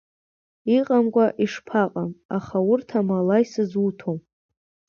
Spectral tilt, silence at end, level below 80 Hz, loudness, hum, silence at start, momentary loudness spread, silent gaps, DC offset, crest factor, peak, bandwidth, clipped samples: -7.5 dB/octave; 0.7 s; -64 dBFS; -23 LUFS; none; 0.65 s; 11 LU; 2.25-2.29 s; under 0.1%; 16 dB; -6 dBFS; 7 kHz; under 0.1%